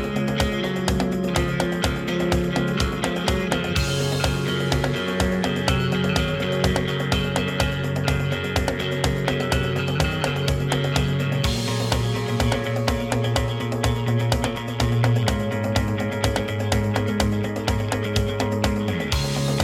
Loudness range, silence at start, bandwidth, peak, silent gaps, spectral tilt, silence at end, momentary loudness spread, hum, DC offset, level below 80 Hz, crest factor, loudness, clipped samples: 1 LU; 0 s; 16.5 kHz; -4 dBFS; none; -5.5 dB/octave; 0 s; 2 LU; none; under 0.1%; -34 dBFS; 18 dB; -23 LUFS; under 0.1%